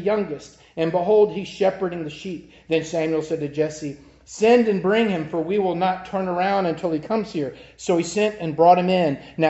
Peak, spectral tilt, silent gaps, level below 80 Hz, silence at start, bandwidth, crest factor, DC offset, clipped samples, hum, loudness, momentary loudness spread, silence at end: -4 dBFS; -6 dB/octave; none; -58 dBFS; 0 s; 8.2 kHz; 18 dB; under 0.1%; under 0.1%; none; -21 LUFS; 15 LU; 0 s